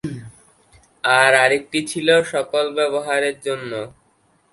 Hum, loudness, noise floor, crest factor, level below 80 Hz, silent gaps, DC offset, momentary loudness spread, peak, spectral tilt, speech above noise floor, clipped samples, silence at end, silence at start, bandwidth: none; -18 LUFS; -60 dBFS; 20 dB; -60 dBFS; none; under 0.1%; 17 LU; 0 dBFS; -3 dB/octave; 42 dB; under 0.1%; 0.65 s; 0.05 s; 11.5 kHz